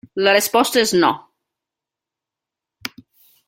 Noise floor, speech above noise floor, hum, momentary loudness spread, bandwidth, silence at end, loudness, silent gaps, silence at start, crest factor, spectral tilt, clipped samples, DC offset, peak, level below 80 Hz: -86 dBFS; 70 dB; none; 18 LU; 16.5 kHz; 0.6 s; -16 LUFS; none; 0.15 s; 20 dB; -2.5 dB/octave; under 0.1%; under 0.1%; -2 dBFS; -64 dBFS